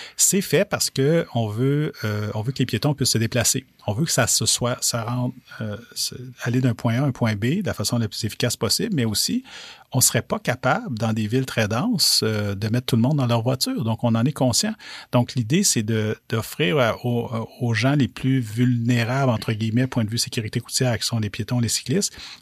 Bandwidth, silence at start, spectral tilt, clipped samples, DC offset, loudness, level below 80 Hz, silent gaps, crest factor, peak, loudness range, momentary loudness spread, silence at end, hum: 15.5 kHz; 0 s; -4 dB/octave; under 0.1%; under 0.1%; -22 LUFS; -54 dBFS; none; 18 dB; -4 dBFS; 2 LU; 9 LU; 0.05 s; none